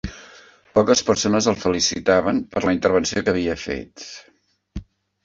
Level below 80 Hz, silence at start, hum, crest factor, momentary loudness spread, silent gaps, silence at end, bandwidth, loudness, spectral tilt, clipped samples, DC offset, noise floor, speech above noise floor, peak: -44 dBFS; 0.05 s; none; 18 dB; 21 LU; none; 0.4 s; 7.8 kHz; -20 LUFS; -4 dB/octave; under 0.1%; under 0.1%; -48 dBFS; 28 dB; -2 dBFS